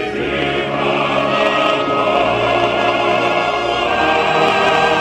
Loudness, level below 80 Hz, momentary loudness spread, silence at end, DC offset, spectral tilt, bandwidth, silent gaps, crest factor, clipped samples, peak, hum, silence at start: -15 LUFS; -42 dBFS; 4 LU; 0 s; under 0.1%; -4.5 dB/octave; 13 kHz; none; 16 dB; under 0.1%; 0 dBFS; none; 0 s